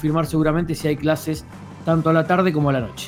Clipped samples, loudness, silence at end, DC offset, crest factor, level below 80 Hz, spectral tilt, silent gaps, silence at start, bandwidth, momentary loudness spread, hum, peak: under 0.1%; -20 LUFS; 0 s; under 0.1%; 16 dB; -42 dBFS; -7 dB/octave; none; 0 s; 16.5 kHz; 11 LU; none; -4 dBFS